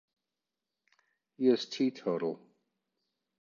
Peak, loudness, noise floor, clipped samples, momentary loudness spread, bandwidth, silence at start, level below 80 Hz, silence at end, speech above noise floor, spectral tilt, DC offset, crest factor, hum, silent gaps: -14 dBFS; -32 LUFS; -90 dBFS; under 0.1%; 9 LU; 7.2 kHz; 1.4 s; -86 dBFS; 1.05 s; 59 dB; -5.5 dB/octave; under 0.1%; 22 dB; none; none